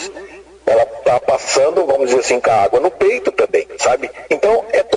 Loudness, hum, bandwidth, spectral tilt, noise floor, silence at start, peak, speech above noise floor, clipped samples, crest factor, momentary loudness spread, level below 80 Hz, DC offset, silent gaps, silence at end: -15 LUFS; none; 10.5 kHz; -3 dB/octave; -36 dBFS; 0 s; -2 dBFS; 21 dB; under 0.1%; 12 dB; 6 LU; -50 dBFS; under 0.1%; none; 0 s